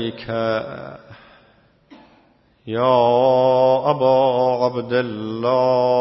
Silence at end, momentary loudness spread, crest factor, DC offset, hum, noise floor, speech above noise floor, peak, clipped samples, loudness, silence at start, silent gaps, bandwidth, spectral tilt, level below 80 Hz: 0 s; 11 LU; 18 dB; under 0.1%; none; -56 dBFS; 38 dB; -2 dBFS; under 0.1%; -18 LUFS; 0 s; none; 6 kHz; -8 dB/octave; -62 dBFS